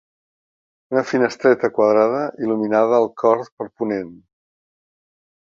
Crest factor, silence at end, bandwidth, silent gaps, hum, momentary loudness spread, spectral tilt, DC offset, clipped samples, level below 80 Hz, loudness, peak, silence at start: 18 dB; 1.45 s; 7.4 kHz; 3.52-3.57 s; none; 10 LU; -6.5 dB/octave; under 0.1%; under 0.1%; -66 dBFS; -19 LUFS; -2 dBFS; 0.9 s